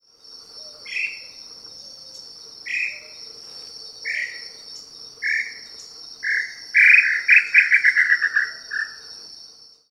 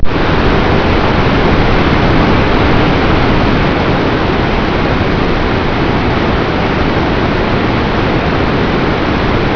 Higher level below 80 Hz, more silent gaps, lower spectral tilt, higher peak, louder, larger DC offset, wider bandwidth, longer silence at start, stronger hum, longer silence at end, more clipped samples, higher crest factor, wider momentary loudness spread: second, -74 dBFS vs -18 dBFS; neither; second, 1.5 dB/octave vs -7.5 dB/octave; about the same, -2 dBFS vs 0 dBFS; second, -17 LUFS vs -12 LUFS; neither; first, 14.5 kHz vs 5.4 kHz; first, 0.3 s vs 0 s; neither; first, 0.45 s vs 0 s; second, under 0.1% vs 0.1%; first, 22 dB vs 10 dB; first, 25 LU vs 3 LU